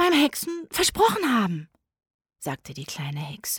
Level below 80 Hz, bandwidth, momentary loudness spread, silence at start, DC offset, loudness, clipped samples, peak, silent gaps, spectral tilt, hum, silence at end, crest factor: -54 dBFS; over 20 kHz; 15 LU; 0 s; under 0.1%; -24 LUFS; under 0.1%; -8 dBFS; 2.14-2.19 s; -3.5 dB/octave; none; 0 s; 18 dB